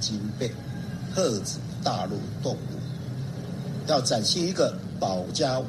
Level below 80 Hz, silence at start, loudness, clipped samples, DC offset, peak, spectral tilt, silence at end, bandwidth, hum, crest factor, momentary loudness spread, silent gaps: -56 dBFS; 0 s; -28 LUFS; under 0.1%; under 0.1%; -10 dBFS; -4.5 dB/octave; 0 s; 13.5 kHz; none; 18 dB; 11 LU; none